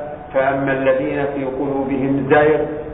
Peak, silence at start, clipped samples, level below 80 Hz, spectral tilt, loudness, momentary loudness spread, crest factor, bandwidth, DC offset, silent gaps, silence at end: -2 dBFS; 0 s; under 0.1%; -44 dBFS; -11.5 dB/octave; -18 LUFS; 8 LU; 16 dB; 4 kHz; under 0.1%; none; 0 s